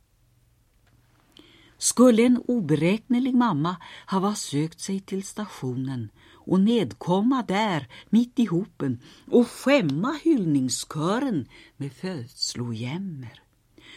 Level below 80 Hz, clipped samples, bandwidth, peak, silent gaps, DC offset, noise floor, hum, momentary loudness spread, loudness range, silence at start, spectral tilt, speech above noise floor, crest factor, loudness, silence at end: -64 dBFS; under 0.1%; 14.5 kHz; -6 dBFS; none; under 0.1%; -62 dBFS; none; 13 LU; 5 LU; 1.8 s; -5.5 dB/octave; 39 dB; 20 dB; -24 LUFS; 0 s